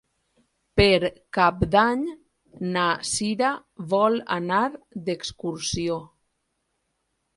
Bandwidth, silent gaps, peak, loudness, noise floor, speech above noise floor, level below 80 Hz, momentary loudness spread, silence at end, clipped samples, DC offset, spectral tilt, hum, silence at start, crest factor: 11.5 kHz; none; -4 dBFS; -24 LUFS; -75 dBFS; 52 dB; -44 dBFS; 12 LU; 1.3 s; under 0.1%; under 0.1%; -4.5 dB/octave; none; 0.75 s; 20 dB